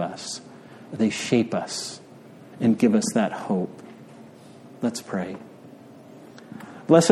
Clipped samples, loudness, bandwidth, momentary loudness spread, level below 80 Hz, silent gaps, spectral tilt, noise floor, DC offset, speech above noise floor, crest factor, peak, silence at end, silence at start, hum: under 0.1%; -25 LUFS; 13 kHz; 26 LU; -68 dBFS; none; -5 dB/octave; -46 dBFS; under 0.1%; 22 dB; 24 dB; 0 dBFS; 0 s; 0 s; none